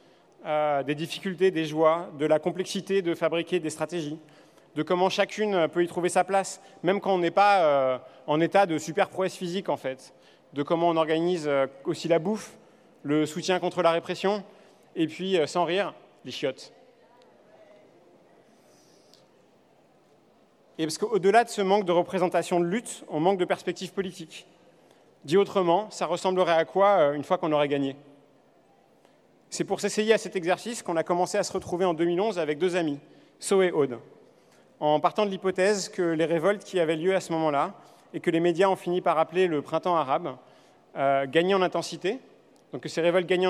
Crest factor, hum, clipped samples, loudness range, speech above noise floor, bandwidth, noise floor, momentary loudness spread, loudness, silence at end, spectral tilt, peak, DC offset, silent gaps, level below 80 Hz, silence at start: 18 dB; none; under 0.1%; 5 LU; 35 dB; 14 kHz; -61 dBFS; 11 LU; -26 LUFS; 0 s; -5 dB/octave; -8 dBFS; under 0.1%; none; -74 dBFS; 0.4 s